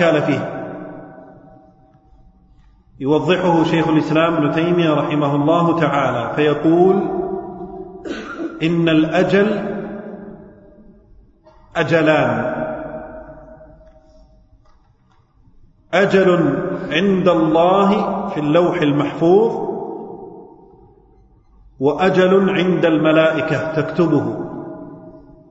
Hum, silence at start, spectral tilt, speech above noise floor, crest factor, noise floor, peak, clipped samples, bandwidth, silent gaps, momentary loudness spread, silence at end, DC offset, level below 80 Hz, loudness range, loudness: none; 0 s; -7.5 dB/octave; 39 dB; 16 dB; -54 dBFS; -2 dBFS; under 0.1%; 8 kHz; none; 18 LU; 0.3 s; under 0.1%; -50 dBFS; 5 LU; -16 LUFS